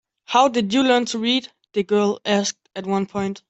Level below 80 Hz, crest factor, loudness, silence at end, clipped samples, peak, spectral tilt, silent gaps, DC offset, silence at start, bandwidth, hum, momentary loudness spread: -64 dBFS; 16 dB; -20 LUFS; 0.1 s; under 0.1%; -4 dBFS; -4 dB/octave; none; under 0.1%; 0.3 s; 8.4 kHz; none; 9 LU